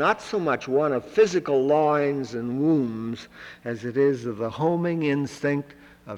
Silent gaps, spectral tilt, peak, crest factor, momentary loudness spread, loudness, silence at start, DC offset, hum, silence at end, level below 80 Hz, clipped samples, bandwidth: none; -6.5 dB/octave; -8 dBFS; 16 dB; 12 LU; -24 LUFS; 0 s; under 0.1%; none; 0 s; -62 dBFS; under 0.1%; 11 kHz